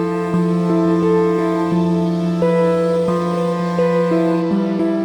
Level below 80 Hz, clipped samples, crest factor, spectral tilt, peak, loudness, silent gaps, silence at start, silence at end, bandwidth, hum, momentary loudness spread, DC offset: -54 dBFS; under 0.1%; 10 dB; -8.5 dB/octave; -6 dBFS; -17 LUFS; none; 0 s; 0 s; 10 kHz; none; 3 LU; under 0.1%